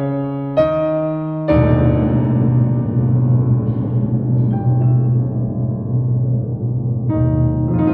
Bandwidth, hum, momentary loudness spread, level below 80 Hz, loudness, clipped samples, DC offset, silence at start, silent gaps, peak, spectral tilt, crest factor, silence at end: 4.1 kHz; none; 6 LU; -32 dBFS; -17 LUFS; under 0.1%; under 0.1%; 0 s; none; -2 dBFS; -12.5 dB/octave; 14 dB; 0 s